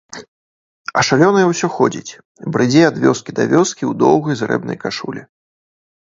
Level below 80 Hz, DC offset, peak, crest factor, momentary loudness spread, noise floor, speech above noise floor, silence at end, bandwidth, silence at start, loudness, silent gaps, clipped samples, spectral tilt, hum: -58 dBFS; under 0.1%; 0 dBFS; 16 dB; 18 LU; under -90 dBFS; over 75 dB; 0.85 s; 7.8 kHz; 0.15 s; -15 LUFS; 0.28-0.85 s, 2.25-2.35 s; under 0.1%; -5 dB/octave; none